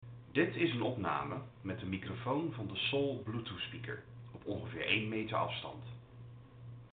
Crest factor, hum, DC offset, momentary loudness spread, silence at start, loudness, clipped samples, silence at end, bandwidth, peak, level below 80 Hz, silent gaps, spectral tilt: 22 dB; none; under 0.1%; 19 LU; 0 s; -37 LUFS; under 0.1%; 0.05 s; 4.7 kHz; -16 dBFS; -68 dBFS; none; -4 dB/octave